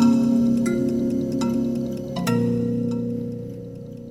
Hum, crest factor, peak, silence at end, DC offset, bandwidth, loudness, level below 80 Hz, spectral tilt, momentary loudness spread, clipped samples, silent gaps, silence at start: none; 14 dB; -8 dBFS; 0 s; under 0.1%; 15 kHz; -23 LUFS; -50 dBFS; -7.5 dB/octave; 15 LU; under 0.1%; none; 0 s